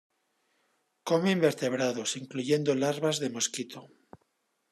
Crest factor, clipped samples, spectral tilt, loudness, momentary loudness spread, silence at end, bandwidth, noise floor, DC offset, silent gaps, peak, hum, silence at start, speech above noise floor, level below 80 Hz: 20 dB; under 0.1%; -4 dB/octave; -29 LUFS; 12 LU; 0.85 s; 13.5 kHz; -76 dBFS; under 0.1%; none; -10 dBFS; none; 1.05 s; 47 dB; -78 dBFS